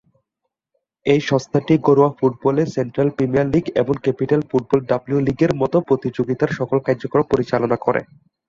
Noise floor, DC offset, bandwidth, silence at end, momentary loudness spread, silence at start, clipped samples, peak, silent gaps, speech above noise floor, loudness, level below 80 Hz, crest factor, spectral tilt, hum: -79 dBFS; under 0.1%; 7.4 kHz; 0.45 s; 5 LU; 1.05 s; under 0.1%; -2 dBFS; none; 61 dB; -19 LUFS; -50 dBFS; 16 dB; -8 dB/octave; none